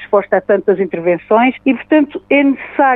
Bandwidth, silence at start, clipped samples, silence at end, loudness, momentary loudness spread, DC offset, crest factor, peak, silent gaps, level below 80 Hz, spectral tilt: 3.9 kHz; 0 s; under 0.1%; 0 s; -14 LUFS; 4 LU; under 0.1%; 12 dB; 0 dBFS; none; -56 dBFS; -9.5 dB/octave